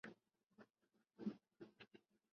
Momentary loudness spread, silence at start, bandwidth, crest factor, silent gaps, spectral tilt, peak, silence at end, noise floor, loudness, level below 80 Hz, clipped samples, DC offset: 14 LU; 0.05 s; 6.6 kHz; 24 dB; 0.70-0.74 s; -6 dB/octave; -34 dBFS; 0.35 s; -86 dBFS; -56 LUFS; under -90 dBFS; under 0.1%; under 0.1%